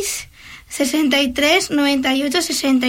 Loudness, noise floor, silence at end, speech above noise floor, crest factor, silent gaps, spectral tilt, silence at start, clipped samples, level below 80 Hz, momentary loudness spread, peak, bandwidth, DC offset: -17 LUFS; -40 dBFS; 0 s; 23 dB; 14 dB; none; -1.5 dB/octave; 0 s; under 0.1%; -48 dBFS; 11 LU; -4 dBFS; 16.5 kHz; under 0.1%